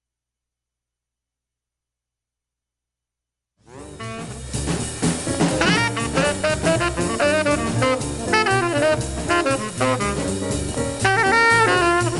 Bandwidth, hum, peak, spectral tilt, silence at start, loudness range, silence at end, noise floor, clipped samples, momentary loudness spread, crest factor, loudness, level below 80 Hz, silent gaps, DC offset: 12 kHz; none; -4 dBFS; -4 dB/octave; 3.7 s; 13 LU; 0 s; -86 dBFS; under 0.1%; 10 LU; 18 dB; -19 LUFS; -38 dBFS; none; under 0.1%